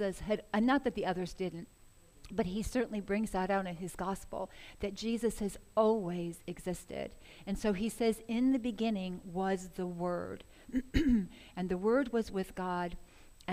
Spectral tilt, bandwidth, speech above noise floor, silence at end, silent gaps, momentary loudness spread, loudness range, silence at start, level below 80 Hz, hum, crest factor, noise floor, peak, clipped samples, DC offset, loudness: -6 dB/octave; 15.5 kHz; 23 dB; 0 s; none; 12 LU; 2 LU; 0 s; -50 dBFS; none; 20 dB; -57 dBFS; -16 dBFS; under 0.1%; under 0.1%; -35 LUFS